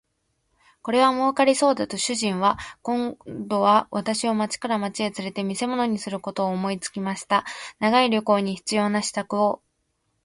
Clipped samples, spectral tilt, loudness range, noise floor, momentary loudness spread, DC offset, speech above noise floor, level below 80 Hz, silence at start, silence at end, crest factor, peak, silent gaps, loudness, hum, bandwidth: under 0.1%; -4 dB/octave; 4 LU; -73 dBFS; 10 LU; under 0.1%; 50 dB; -62 dBFS; 0.85 s; 0.7 s; 18 dB; -6 dBFS; none; -23 LUFS; none; 11.5 kHz